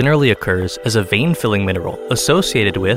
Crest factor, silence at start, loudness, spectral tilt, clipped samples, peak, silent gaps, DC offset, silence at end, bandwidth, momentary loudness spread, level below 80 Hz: 16 dB; 0 s; -16 LUFS; -5 dB/octave; under 0.1%; 0 dBFS; none; under 0.1%; 0 s; 16 kHz; 6 LU; -42 dBFS